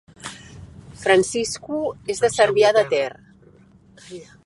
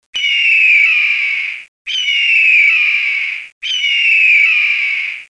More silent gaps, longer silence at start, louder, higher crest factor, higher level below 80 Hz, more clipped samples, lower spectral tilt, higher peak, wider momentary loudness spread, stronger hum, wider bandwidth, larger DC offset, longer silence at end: second, none vs 1.68-1.85 s, 3.52-3.61 s; about the same, 0.25 s vs 0.15 s; second, -20 LUFS vs -10 LUFS; first, 20 dB vs 10 dB; first, -54 dBFS vs -62 dBFS; neither; first, -3.5 dB/octave vs 4.5 dB/octave; about the same, -2 dBFS vs -2 dBFS; first, 23 LU vs 12 LU; neither; about the same, 11.5 kHz vs 10.5 kHz; neither; first, 0.2 s vs 0.05 s